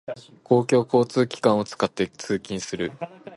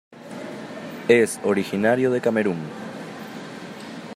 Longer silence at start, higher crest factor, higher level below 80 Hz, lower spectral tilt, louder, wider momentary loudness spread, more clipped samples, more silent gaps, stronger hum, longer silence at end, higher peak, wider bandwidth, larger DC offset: about the same, 0.1 s vs 0.1 s; about the same, 18 dB vs 20 dB; first, -60 dBFS vs -70 dBFS; about the same, -5.5 dB/octave vs -5.5 dB/octave; about the same, -23 LUFS vs -21 LUFS; second, 12 LU vs 18 LU; neither; neither; neither; about the same, 0 s vs 0 s; about the same, -4 dBFS vs -4 dBFS; second, 11.5 kHz vs 15 kHz; neither